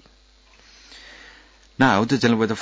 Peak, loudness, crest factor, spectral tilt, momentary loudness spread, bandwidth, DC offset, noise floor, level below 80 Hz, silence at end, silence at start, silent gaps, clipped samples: -6 dBFS; -19 LUFS; 18 dB; -5.5 dB/octave; 25 LU; 8 kHz; under 0.1%; -54 dBFS; -54 dBFS; 0 s; 0.95 s; none; under 0.1%